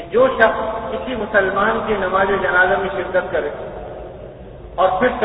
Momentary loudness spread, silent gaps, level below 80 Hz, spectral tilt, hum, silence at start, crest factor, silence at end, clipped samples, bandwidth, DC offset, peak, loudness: 18 LU; none; -40 dBFS; -9 dB/octave; none; 0 s; 18 dB; 0 s; under 0.1%; 5 kHz; under 0.1%; 0 dBFS; -17 LUFS